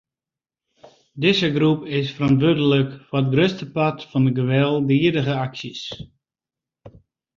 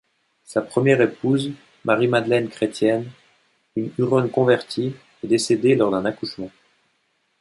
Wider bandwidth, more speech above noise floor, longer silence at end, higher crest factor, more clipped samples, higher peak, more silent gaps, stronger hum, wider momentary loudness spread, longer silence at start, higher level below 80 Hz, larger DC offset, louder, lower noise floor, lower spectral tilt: second, 7.2 kHz vs 11.5 kHz; first, 70 dB vs 48 dB; second, 0.5 s vs 0.95 s; about the same, 18 dB vs 18 dB; neither; about the same, -2 dBFS vs -2 dBFS; neither; neither; about the same, 11 LU vs 13 LU; first, 1.15 s vs 0.5 s; first, -56 dBFS vs -62 dBFS; neither; about the same, -20 LUFS vs -21 LUFS; first, -90 dBFS vs -68 dBFS; first, -7.5 dB/octave vs -6 dB/octave